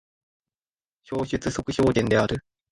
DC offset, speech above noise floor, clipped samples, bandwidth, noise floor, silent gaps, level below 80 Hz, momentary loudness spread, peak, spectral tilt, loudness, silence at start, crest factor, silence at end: under 0.1%; over 67 dB; under 0.1%; 11.5 kHz; under -90 dBFS; none; -46 dBFS; 11 LU; -6 dBFS; -6 dB/octave; -25 LUFS; 1.1 s; 20 dB; 0.35 s